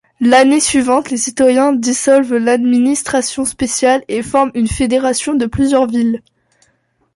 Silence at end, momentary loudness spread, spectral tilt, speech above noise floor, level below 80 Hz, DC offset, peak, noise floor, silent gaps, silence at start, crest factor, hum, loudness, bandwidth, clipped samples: 0.95 s; 6 LU; -3.5 dB/octave; 48 dB; -40 dBFS; under 0.1%; 0 dBFS; -60 dBFS; none; 0.2 s; 12 dB; none; -13 LUFS; 11.5 kHz; under 0.1%